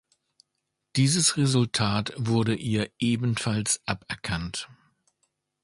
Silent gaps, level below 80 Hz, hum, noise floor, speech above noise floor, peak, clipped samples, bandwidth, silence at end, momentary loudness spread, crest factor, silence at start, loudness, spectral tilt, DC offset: none; -52 dBFS; none; -81 dBFS; 55 dB; -8 dBFS; under 0.1%; 11.5 kHz; 1 s; 10 LU; 18 dB; 0.95 s; -26 LUFS; -4 dB/octave; under 0.1%